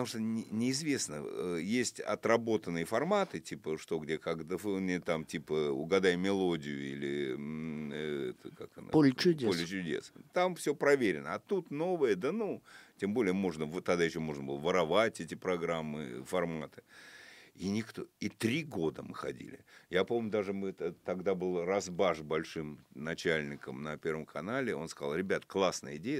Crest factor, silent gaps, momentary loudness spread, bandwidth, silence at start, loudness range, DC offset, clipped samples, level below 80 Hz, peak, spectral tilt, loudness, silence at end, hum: 22 dB; none; 12 LU; 16 kHz; 0 s; 5 LU; under 0.1%; under 0.1%; -68 dBFS; -12 dBFS; -5 dB/octave; -34 LUFS; 0 s; none